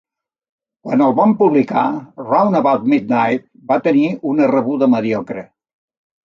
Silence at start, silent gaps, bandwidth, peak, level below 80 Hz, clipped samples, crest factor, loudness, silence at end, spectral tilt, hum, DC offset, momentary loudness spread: 0.85 s; none; 6.8 kHz; -2 dBFS; -62 dBFS; under 0.1%; 14 dB; -15 LUFS; 0.8 s; -8.5 dB/octave; none; under 0.1%; 10 LU